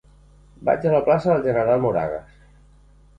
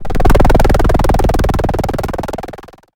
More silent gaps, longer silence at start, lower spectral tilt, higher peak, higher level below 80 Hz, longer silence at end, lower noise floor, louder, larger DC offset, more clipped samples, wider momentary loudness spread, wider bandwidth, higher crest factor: neither; first, 0.6 s vs 0 s; first, -9 dB/octave vs -6.5 dB/octave; second, -6 dBFS vs 0 dBFS; second, -50 dBFS vs -14 dBFS; first, 0.95 s vs 0.3 s; first, -51 dBFS vs -33 dBFS; second, -20 LUFS vs -14 LUFS; neither; neither; about the same, 10 LU vs 12 LU; second, 7.6 kHz vs 17 kHz; about the same, 16 dB vs 12 dB